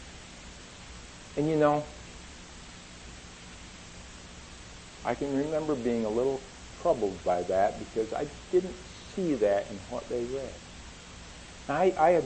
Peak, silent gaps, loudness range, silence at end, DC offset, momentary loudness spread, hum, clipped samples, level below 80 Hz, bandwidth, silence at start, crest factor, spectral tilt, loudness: -10 dBFS; none; 7 LU; 0 s; under 0.1%; 19 LU; none; under 0.1%; -52 dBFS; 8.8 kHz; 0 s; 20 dB; -5.5 dB/octave; -30 LUFS